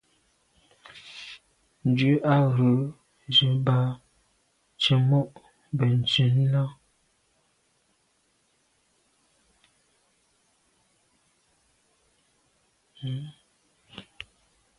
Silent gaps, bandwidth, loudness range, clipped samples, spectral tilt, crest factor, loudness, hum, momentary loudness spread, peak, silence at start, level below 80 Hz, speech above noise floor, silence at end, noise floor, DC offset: none; 10.5 kHz; 19 LU; under 0.1%; -7 dB/octave; 20 dB; -24 LUFS; none; 24 LU; -8 dBFS; 0.95 s; -64 dBFS; 47 dB; 0.8 s; -69 dBFS; under 0.1%